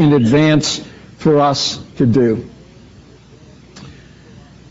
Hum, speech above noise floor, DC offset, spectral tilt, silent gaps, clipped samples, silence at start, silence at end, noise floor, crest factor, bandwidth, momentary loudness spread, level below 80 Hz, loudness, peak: none; 29 dB; under 0.1%; -5.5 dB/octave; none; under 0.1%; 0 s; 0.8 s; -42 dBFS; 14 dB; 8 kHz; 12 LU; -46 dBFS; -14 LUFS; -2 dBFS